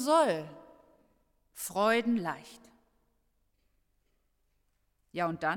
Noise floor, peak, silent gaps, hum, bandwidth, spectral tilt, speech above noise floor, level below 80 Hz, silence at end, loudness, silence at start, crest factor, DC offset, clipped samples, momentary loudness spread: -75 dBFS; -14 dBFS; none; 50 Hz at -70 dBFS; 17.5 kHz; -4.5 dB/octave; 45 dB; -72 dBFS; 0 s; -30 LUFS; 0 s; 20 dB; under 0.1%; under 0.1%; 18 LU